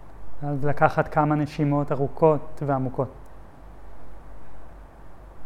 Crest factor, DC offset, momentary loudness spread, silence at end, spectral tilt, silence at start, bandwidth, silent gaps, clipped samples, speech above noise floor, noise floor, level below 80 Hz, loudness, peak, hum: 20 dB; under 0.1%; 10 LU; 0 s; -9 dB/octave; 0 s; 9.6 kHz; none; under 0.1%; 22 dB; -45 dBFS; -46 dBFS; -24 LUFS; -4 dBFS; none